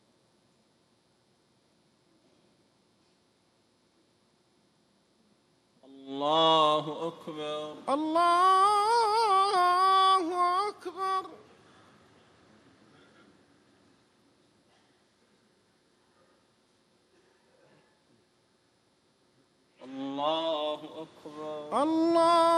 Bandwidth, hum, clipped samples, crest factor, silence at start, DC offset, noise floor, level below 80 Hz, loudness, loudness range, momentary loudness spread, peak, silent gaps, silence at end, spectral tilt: 14 kHz; none; under 0.1%; 18 dB; 6 s; under 0.1%; -69 dBFS; -84 dBFS; -26 LUFS; 15 LU; 18 LU; -12 dBFS; none; 0 s; -3.5 dB/octave